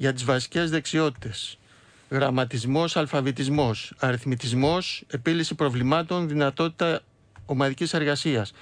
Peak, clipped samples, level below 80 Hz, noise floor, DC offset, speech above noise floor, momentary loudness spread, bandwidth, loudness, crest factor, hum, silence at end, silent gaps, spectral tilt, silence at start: -10 dBFS; under 0.1%; -56 dBFS; -55 dBFS; under 0.1%; 30 dB; 5 LU; 10.5 kHz; -25 LUFS; 14 dB; none; 0.1 s; none; -5.5 dB/octave; 0 s